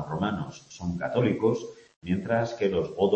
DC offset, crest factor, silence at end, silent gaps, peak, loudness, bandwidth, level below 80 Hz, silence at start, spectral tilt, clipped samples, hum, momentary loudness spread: under 0.1%; 16 dB; 0 s; 1.96-2.02 s; -12 dBFS; -28 LUFS; 8.4 kHz; -56 dBFS; 0 s; -7 dB/octave; under 0.1%; none; 12 LU